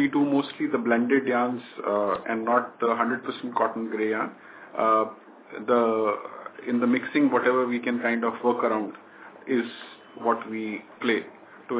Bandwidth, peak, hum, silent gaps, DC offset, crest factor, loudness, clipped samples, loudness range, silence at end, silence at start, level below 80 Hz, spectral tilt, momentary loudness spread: 4 kHz; -8 dBFS; none; none; under 0.1%; 18 dB; -26 LUFS; under 0.1%; 3 LU; 0 s; 0 s; -78 dBFS; -9.5 dB/octave; 13 LU